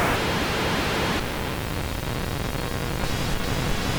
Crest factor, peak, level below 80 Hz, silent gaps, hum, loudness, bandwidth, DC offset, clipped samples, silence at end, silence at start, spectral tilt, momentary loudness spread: 16 dB; -8 dBFS; -34 dBFS; none; none; -26 LUFS; over 20 kHz; under 0.1%; under 0.1%; 0 s; 0 s; -4.5 dB/octave; 5 LU